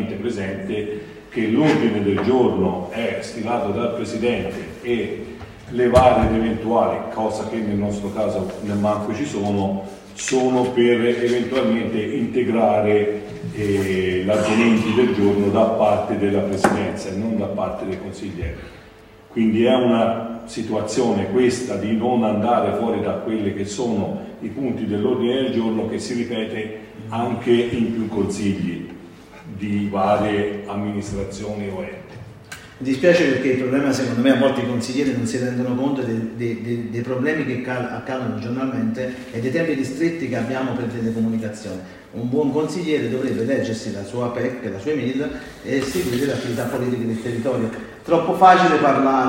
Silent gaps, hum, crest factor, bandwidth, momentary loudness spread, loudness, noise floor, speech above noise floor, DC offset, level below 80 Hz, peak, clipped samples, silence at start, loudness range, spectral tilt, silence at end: none; none; 20 dB; 16 kHz; 13 LU; -21 LUFS; -45 dBFS; 25 dB; under 0.1%; -46 dBFS; 0 dBFS; under 0.1%; 0 s; 5 LU; -6 dB/octave; 0 s